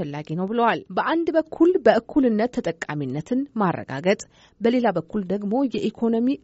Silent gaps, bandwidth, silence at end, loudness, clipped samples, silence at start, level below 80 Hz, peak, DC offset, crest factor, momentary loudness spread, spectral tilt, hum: none; 8 kHz; 0.05 s; -23 LUFS; under 0.1%; 0 s; -58 dBFS; -4 dBFS; under 0.1%; 18 dB; 9 LU; -5.5 dB/octave; none